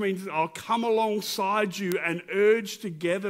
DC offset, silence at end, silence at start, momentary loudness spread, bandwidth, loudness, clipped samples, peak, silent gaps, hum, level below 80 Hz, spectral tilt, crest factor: under 0.1%; 0 s; 0 s; 6 LU; 16 kHz; -26 LUFS; under 0.1%; -6 dBFS; none; none; -74 dBFS; -4.5 dB/octave; 20 dB